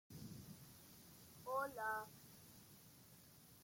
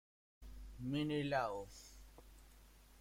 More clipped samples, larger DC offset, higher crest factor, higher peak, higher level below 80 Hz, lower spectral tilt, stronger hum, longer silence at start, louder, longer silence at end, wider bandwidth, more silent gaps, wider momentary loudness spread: neither; neither; about the same, 20 dB vs 20 dB; second, -32 dBFS vs -24 dBFS; second, -80 dBFS vs -60 dBFS; second, -4 dB/octave vs -6 dB/octave; neither; second, 0.1 s vs 0.4 s; second, -50 LUFS vs -41 LUFS; about the same, 0 s vs 0 s; about the same, 16.5 kHz vs 16.5 kHz; neither; second, 18 LU vs 25 LU